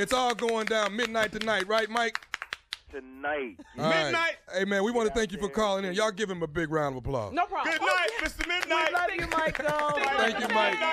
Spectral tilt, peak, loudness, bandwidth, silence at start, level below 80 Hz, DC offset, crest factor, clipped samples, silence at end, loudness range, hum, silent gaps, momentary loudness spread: -3.5 dB/octave; -12 dBFS; -28 LUFS; 15.5 kHz; 0 s; -52 dBFS; under 0.1%; 16 dB; under 0.1%; 0 s; 3 LU; none; none; 9 LU